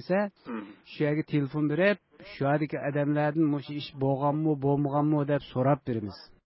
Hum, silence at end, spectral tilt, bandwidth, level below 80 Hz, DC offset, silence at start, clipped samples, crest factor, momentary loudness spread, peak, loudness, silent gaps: none; 0.25 s; -11.5 dB/octave; 5.8 kHz; -62 dBFS; under 0.1%; 0 s; under 0.1%; 16 dB; 12 LU; -12 dBFS; -28 LUFS; none